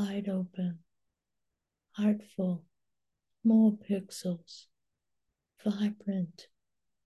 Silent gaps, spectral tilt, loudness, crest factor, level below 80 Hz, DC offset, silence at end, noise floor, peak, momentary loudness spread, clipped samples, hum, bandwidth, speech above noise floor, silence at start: none; -7.5 dB/octave; -32 LUFS; 18 dB; -80 dBFS; under 0.1%; 0.65 s; -88 dBFS; -16 dBFS; 16 LU; under 0.1%; none; 12 kHz; 58 dB; 0 s